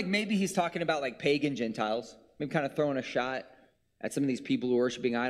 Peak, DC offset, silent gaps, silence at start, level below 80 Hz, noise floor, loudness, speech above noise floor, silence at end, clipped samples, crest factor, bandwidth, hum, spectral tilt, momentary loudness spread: -14 dBFS; under 0.1%; none; 0 s; -70 dBFS; -62 dBFS; -31 LUFS; 31 dB; 0 s; under 0.1%; 18 dB; 14.5 kHz; none; -5 dB/octave; 8 LU